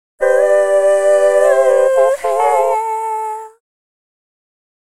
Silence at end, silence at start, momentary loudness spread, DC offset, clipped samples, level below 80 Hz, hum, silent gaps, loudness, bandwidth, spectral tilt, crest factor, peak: 1.45 s; 0.2 s; 9 LU; 1%; under 0.1%; -60 dBFS; none; none; -13 LUFS; 13.5 kHz; -1.5 dB/octave; 14 dB; 0 dBFS